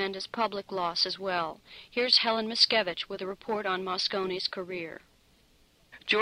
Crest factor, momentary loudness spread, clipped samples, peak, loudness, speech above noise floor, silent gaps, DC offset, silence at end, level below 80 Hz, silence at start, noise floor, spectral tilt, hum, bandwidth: 22 dB; 14 LU; under 0.1%; -8 dBFS; -28 LUFS; 33 dB; none; under 0.1%; 0 s; -68 dBFS; 0 s; -63 dBFS; -3 dB/octave; none; 15.5 kHz